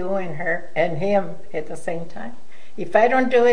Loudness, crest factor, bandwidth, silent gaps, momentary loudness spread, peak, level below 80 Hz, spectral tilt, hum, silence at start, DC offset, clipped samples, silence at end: -22 LUFS; 18 dB; 10 kHz; none; 19 LU; -2 dBFS; -58 dBFS; -6 dB/octave; none; 0 s; 6%; under 0.1%; 0 s